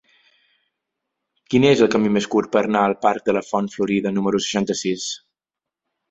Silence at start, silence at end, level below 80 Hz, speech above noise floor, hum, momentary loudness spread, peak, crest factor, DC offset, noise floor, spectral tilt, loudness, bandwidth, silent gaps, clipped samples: 1.5 s; 0.95 s; -58 dBFS; 68 dB; none; 8 LU; -2 dBFS; 20 dB; under 0.1%; -87 dBFS; -5 dB/octave; -20 LUFS; 8 kHz; none; under 0.1%